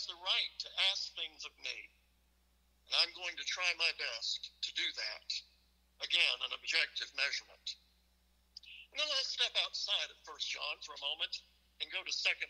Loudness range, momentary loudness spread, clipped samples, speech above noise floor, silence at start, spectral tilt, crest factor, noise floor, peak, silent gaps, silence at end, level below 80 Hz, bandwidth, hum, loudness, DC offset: 2 LU; 13 LU; under 0.1%; 34 dB; 0 s; 2 dB/octave; 24 dB; -72 dBFS; -16 dBFS; none; 0 s; -74 dBFS; 15.5 kHz; none; -36 LUFS; under 0.1%